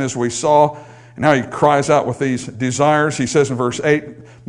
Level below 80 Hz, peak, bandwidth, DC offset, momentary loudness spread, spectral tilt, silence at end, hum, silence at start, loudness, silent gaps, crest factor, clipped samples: -54 dBFS; 0 dBFS; 11 kHz; under 0.1%; 7 LU; -5 dB/octave; 0.25 s; none; 0 s; -16 LUFS; none; 16 dB; under 0.1%